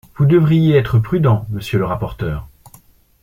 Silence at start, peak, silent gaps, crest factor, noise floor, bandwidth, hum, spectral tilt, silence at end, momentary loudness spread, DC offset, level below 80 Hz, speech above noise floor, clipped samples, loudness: 0.2 s; -2 dBFS; none; 14 dB; -48 dBFS; 16 kHz; none; -8.5 dB/octave; 0.75 s; 12 LU; under 0.1%; -38 dBFS; 34 dB; under 0.1%; -16 LUFS